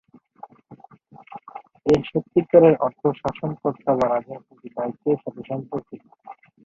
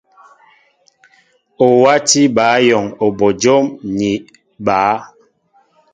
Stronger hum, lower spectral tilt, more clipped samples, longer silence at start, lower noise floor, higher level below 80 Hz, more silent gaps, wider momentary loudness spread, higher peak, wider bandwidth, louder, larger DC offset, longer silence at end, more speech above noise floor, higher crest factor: neither; first, -8.5 dB/octave vs -4 dB/octave; neither; second, 0.7 s vs 1.6 s; second, -48 dBFS vs -56 dBFS; about the same, -56 dBFS vs -54 dBFS; neither; first, 24 LU vs 9 LU; about the same, -2 dBFS vs 0 dBFS; second, 7.4 kHz vs 9.6 kHz; second, -22 LUFS vs -13 LUFS; neither; second, 0.3 s vs 0.9 s; second, 27 dB vs 43 dB; first, 22 dB vs 16 dB